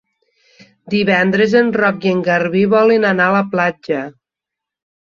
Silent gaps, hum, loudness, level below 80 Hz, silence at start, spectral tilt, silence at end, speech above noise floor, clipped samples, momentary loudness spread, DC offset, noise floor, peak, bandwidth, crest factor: none; none; -14 LUFS; -58 dBFS; 0.85 s; -7 dB/octave; 0.9 s; 70 dB; under 0.1%; 9 LU; under 0.1%; -84 dBFS; 0 dBFS; 7.2 kHz; 16 dB